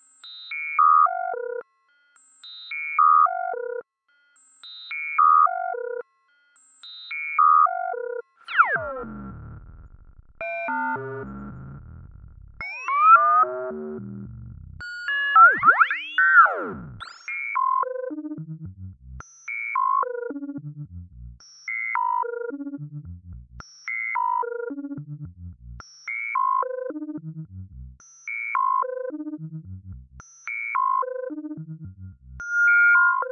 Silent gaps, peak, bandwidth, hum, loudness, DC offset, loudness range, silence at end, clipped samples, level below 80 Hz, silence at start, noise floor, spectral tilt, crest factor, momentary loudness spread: none; -4 dBFS; 8.6 kHz; none; -21 LUFS; under 0.1%; 12 LU; 0 s; under 0.1%; -54 dBFS; 0.25 s; -66 dBFS; -5 dB/octave; 20 dB; 25 LU